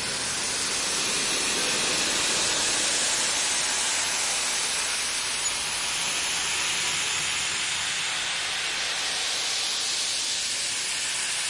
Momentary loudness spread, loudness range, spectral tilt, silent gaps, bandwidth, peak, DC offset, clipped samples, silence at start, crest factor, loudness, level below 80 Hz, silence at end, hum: 3 LU; 2 LU; 1 dB/octave; none; 11.5 kHz; -12 dBFS; under 0.1%; under 0.1%; 0 s; 16 dB; -24 LUFS; -58 dBFS; 0 s; none